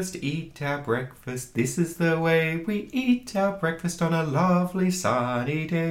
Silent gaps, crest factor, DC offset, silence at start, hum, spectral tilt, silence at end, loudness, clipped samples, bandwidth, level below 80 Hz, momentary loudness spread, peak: none; 16 dB; under 0.1%; 0 s; none; -6 dB/octave; 0 s; -26 LUFS; under 0.1%; 16.5 kHz; -56 dBFS; 8 LU; -10 dBFS